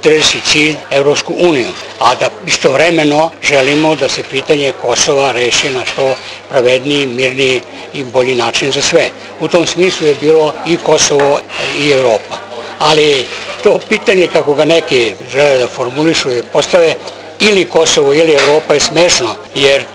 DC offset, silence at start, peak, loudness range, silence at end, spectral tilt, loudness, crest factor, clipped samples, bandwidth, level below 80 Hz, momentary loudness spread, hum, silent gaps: under 0.1%; 0 s; 0 dBFS; 2 LU; 0 s; -3 dB/octave; -10 LUFS; 10 dB; 0.2%; 11.5 kHz; -46 dBFS; 7 LU; none; none